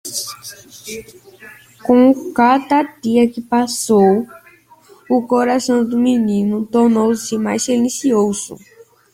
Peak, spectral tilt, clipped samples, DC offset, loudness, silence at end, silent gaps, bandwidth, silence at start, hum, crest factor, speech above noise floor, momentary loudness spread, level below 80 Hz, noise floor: -2 dBFS; -5 dB/octave; under 0.1%; under 0.1%; -15 LUFS; 0.6 s; none; 16 kHz; 0.05 s; none; 14 dB; 32 dB; 18 LU; -56 dBFS; -47 dBFS